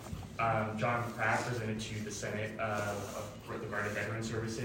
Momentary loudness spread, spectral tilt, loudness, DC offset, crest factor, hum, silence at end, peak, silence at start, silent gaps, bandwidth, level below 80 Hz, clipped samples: 9 LU; -5 dB/octave; -36 LUFS; under 0.1%; 20 dB; none; 0 s; -16 dBFS; 0 s; none; 16 kHz; -58 dBFS; under 0.1%